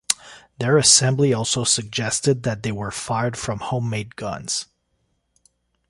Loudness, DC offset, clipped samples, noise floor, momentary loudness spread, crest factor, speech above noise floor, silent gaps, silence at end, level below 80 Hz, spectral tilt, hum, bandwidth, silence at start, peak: -20 LUFS; under 0.1%; under 0.1%; -70 dBFS; 14 LU; 22 dB; 49 dB; none; 1.25 s; -52 dBFS; -3 dB/octave; none; 16 kHz; 0.1 s; 0 dBFS